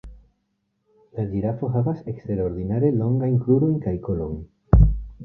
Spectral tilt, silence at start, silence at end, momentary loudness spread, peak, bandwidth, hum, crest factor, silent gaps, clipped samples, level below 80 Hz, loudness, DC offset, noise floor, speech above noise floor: -13.5 dB/octave; 0.05 s; 0 s; 13 LU; -2 dBFS; 2.7 kHz; none; 20 dB; none; under 0.1%; -28 dBFS; -23 LUFS; under 0.1%; -73 dBFS; 50 dB